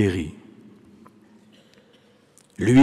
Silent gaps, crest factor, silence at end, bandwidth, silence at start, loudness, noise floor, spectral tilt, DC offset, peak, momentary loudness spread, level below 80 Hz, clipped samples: none; 16 dB; 0 s; 11.5 kHz; 0 s; -24 LUFS; -57 dBFS; -7 dB/octave; under 0.1%; -8 dBFS; 29 LU; -52 dBFS; under 0.1%